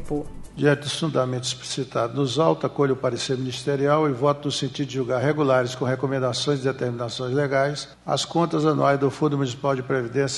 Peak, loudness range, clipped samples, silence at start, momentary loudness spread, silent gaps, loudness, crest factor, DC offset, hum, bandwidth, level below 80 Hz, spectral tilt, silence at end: -6 dBFS; 1 LU; under 0.1%; 0 s; 7 LU; none; -23 LUFS; 18 dB; under 0.1%; none; 11.5 kHz; -50 dBFS; -5.5 dB/octave; 0 s